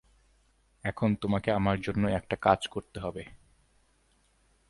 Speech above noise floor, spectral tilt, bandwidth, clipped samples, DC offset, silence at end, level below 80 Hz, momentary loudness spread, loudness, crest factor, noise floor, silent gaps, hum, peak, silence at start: 39 dB; -7 dB/octave; 11.5 kHz; under 0.1%; under 0.1%; 1.35 s; -52 dBFS; 12 LU; -30 LUFS; 26 dB; -68 dBFS; none; none; -6 dBFS; 0.85 s